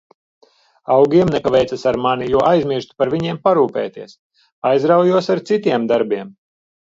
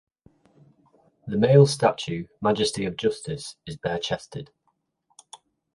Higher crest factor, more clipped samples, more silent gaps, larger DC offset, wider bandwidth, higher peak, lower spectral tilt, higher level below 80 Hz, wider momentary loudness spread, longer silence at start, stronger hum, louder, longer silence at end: second, 16 dB vs 22 dB; neither; first, 4.19-4.30 s, 4.52-4.62 s vs none; neither; second, 7.8 kHz vs 11.5 kHz; first, 0 dBFS vs -4 dBFS; about the same, -7 dB/octave vs -6 dB/octave; first, -50 dBFS vs -58 dBFS; second, 11 LU vs 19 LU; second, 0.9 s vs 1.25 s; neither; first, -16 LUFS vs -24 LUFS; second, 0.55 s vs 1.3 s